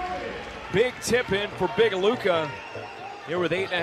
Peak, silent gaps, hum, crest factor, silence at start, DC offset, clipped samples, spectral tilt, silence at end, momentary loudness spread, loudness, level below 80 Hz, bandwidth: -10 dBFS; none; none; 16 dB; 0 s; under 0.1%; under 0.1%; -4.5 dB/octave; 0 s; 14 LU; -25 LUFS; -52 dBFS; 14 kHz